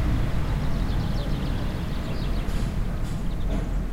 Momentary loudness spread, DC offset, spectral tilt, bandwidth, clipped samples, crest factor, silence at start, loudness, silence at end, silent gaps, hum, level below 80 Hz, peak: 3 LU; under 0.1%; -7 dB/octave; 15.5 kHz; under 0.1%; 12 dB; 0 s; -29 LUFS; 0 s; none; none; -28 dBFS; -12 dBFS